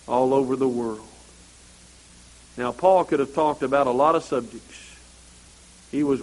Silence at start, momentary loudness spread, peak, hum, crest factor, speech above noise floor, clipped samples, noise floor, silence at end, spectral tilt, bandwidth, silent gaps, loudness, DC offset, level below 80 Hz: 0.05 s; 22 LU; -4 dBFS; none; 20 dB; 28 dB; under 0.1%; -50 dBFS; 0 s; -6 dB/octave; 11.5 kHz; none; -22 LUFS; under 0.1%; -54 dBFS